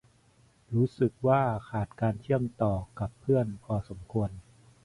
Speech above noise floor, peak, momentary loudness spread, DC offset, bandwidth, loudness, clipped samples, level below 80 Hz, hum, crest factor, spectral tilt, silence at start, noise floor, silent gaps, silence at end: 34 dB; -12 dBFS; 10 LU; under 0.1%; 11 kHz; -30 LUFS; under 0.1%; -52 dBFS; none; 18 dB; -9.5 dB/octave; 0.7 s; -63 dBFS; none; 0.45 s